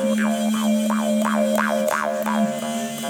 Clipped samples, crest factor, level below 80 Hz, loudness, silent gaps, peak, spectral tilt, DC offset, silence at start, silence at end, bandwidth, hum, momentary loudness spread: under 0.1%; 16 dB; -70 dBFS; -21 LUFS; none; -6 dBFS; -4.5 dB/octave; under 0.1%; 0 s; 0 s; 20 kHz; none; 3 LU